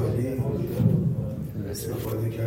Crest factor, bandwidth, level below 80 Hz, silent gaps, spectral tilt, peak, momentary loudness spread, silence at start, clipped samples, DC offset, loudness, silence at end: 18 dB; 16.5 kHz; -44 dBFS; none; -8 dB/octave; -8 dBFS; 9 LU; 0 s; under 0.1%; under 0.1%; -27 LUFS; 0 s